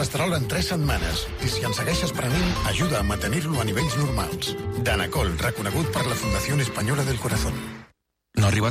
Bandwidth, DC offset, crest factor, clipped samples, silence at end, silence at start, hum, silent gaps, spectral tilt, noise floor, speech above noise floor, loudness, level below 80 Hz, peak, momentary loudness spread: 15.5 kHz; under 0.1%; 14 dB; under 0.1%; 0 s; 0 s; none; none; -4.5 dB/octave; -61 dBFS; 37 dB; -24 LUFS; -34 dBFS; -12 dBFS; 4 LU